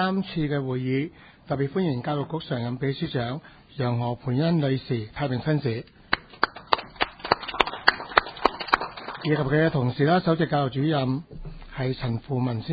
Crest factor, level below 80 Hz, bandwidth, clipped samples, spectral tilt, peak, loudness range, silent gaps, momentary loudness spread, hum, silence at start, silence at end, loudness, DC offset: 26 dB; -50 dBFS; 8 kHz; under 0.1%; -8 dB/octave; 0 dBFS; 5 LU; none; 9 LU; none; 0 s; 0 s; -26 LUFS; under 0.1%